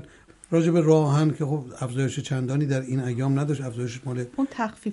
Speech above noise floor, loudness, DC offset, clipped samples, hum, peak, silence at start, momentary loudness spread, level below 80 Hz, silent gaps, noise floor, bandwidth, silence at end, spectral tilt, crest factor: 26 dB; -25 LUFS; under 0.1%; under 0.1%; none; -8 dBFS; 0 s; 11 LU; -62 dBFS; none; -50 dBFS; 11.5 kHz; 0 s; -7.5 dB/octave; 16 dB